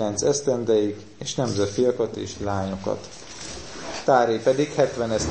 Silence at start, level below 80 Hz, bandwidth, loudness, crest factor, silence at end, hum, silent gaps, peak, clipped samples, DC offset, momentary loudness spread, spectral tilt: 0 s; -50 dBFS; 8.8 kHz; -24 LUFS; 20 dB; 0 s; none; none; -4 dBFS; under 0.1%; 0.3%; 15 LU; -4.5 dB/octave